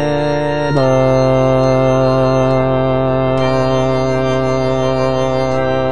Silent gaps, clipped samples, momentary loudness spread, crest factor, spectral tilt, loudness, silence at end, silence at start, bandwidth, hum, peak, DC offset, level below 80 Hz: none; under 0.1%; 3 LU; 12 dB; -7 dB/octave; -14 LUFS; 0 s; 0 s; 10 kHz; none; -2 dBFS; 4%; -38 dBFS